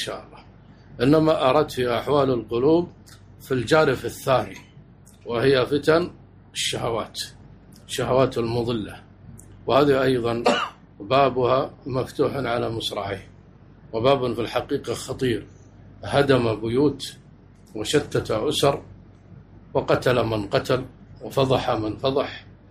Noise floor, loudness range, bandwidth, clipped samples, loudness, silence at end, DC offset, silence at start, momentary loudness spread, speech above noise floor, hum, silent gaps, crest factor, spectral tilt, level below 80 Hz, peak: -49 dBFS; 4 LU; 15.5 kHz; under 0.1%; -23 LUFS; 0.15 s; under 0.1%; 0 s; 14 LU; 27 dB; none; none; 18 dB; -5.5 dB/octave; -50 dBFS; -6 dBFS